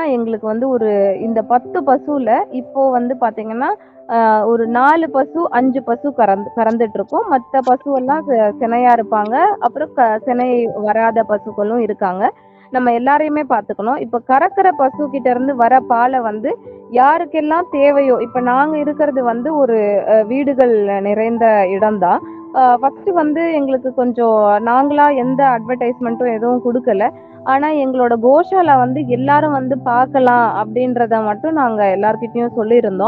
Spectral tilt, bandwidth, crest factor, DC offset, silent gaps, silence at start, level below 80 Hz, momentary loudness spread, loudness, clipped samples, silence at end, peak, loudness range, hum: -9 dB/octave; 5 kHz; 14 dB; under 0.1%; none; 0 s; -60 dBFS; 7 LU; -15 LUFS; under 0.1%; 0 s; 0 dBFS; 2 LU; none